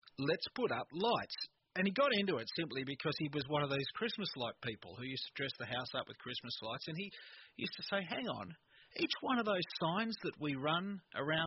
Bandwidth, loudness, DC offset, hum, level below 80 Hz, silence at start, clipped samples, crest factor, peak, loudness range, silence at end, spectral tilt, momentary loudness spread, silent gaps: 5.8 kHz; -39 LUFS; under 0.1%; none; -76 dBFS; 0.05 s; under 0.1%; 18 dB; -22 dBFS; 6 LU; 0 s; -3 dB/octave; 10 LU; none